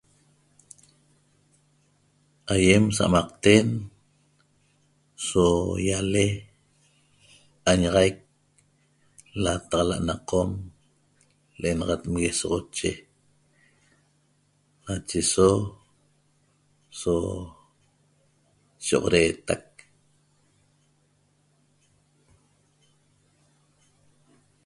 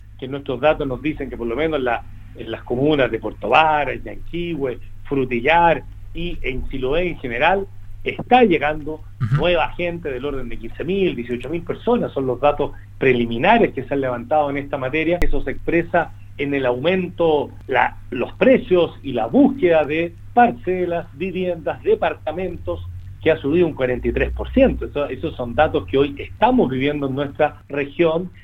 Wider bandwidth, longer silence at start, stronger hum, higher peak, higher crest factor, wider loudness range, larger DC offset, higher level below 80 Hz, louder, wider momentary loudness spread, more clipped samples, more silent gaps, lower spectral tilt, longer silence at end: first, 11.5 kHz vs 6.8 kHz; first, 2.45 s vs 0 s; neither; about the same, -2 dBFS vs 0 dBFS; first, 26 dB vs 20 dB; first, 7 LU vs 4 LU; neither; second, -46 dBFS vs -32 dBFS; second, -24 LUFS vs -20 LUFS; first, 18 LU vs 12 LU; neither; neither; second, -4.5 dB/octave vs -8 dB/octave; first, 5.05 s vs 0 s